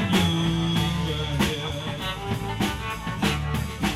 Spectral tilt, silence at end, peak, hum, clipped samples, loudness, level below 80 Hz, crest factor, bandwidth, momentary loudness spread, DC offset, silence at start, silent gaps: -5 dB/octave; 0 s; -10 dBFS; none; under 0.1%; -26 LUFS; -38 dBFS; 16 dB; 16 kHz; 7 LU; under 0.1%; 0 s; none